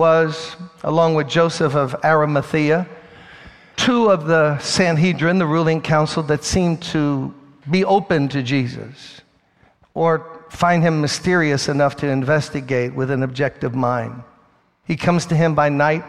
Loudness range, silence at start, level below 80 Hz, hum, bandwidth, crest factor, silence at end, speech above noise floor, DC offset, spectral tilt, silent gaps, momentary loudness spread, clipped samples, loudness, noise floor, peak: 4 LU; 0 s; -48 dBFS; none; 12 kHz; 16 dB; 0 s; 39 dB; 0.2%; -5.5 dB/octave; none; 12 LU; under 0.1%; -18 LUFS; -57 dBFS; -2 dBFS